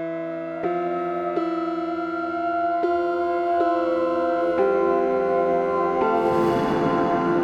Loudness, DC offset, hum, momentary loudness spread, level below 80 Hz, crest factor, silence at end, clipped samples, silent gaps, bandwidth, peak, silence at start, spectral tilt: -23 LUFS; under 0.1%; none; 6 LU; -56 dBFS; 12 dB; 0 s; under 0.1%; none; 8 kHz; -10 dBFS; 0 s; -7.5 dB/octave